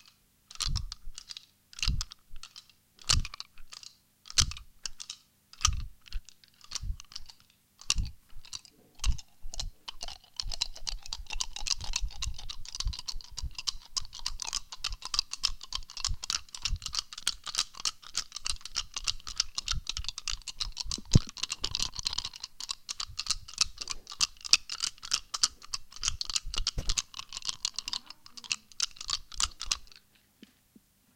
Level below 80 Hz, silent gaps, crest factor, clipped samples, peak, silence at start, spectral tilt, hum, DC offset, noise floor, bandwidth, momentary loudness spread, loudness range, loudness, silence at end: -42 dBFS; none; 34 dB; under 0.1%; 0 dBFS; 0.5 s; -1 dB/octave; none; under 0.1%; -64 dBFS; 17 kHz; 15 LU; 8 LU; -33 LUFS; 1.2 s